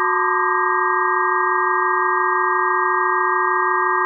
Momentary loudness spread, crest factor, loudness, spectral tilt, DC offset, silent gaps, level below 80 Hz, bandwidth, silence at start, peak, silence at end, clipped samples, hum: 0 LU; 12 dB; -17 LUFS; -9.5 dB/octave; under 0.1%; none; under -90 dBFS; 2 kHz; 0 s; -6 dBFS; 0 s; under 0.1%; none